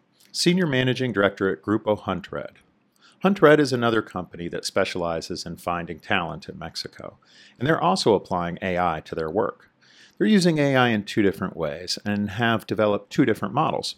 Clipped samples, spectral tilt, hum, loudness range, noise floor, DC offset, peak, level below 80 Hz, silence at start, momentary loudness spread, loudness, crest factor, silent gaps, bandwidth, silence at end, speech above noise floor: under 0.1%; -5.5 dB/octave; none; 5 LU; -59 dBFS; under 0.1%; -2 dBFS; -60 dBFS; 0.35 s; 14 LU; -23 LUFS; 22 dB; none; 16 kHz; 0.05 s; 35 dB